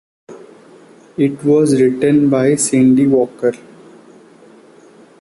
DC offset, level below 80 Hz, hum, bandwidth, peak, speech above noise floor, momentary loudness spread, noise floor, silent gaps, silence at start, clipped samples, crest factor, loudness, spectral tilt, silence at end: under 0.1%; -56 dBFS; none; 11.5 kHz; -2 dBFS; 31 dB; 9 LU; -44 dBFS; none; 0.3 s; under 0.1%; 12 dB; -13 LUFS; -6 dB/octave; 1.65 s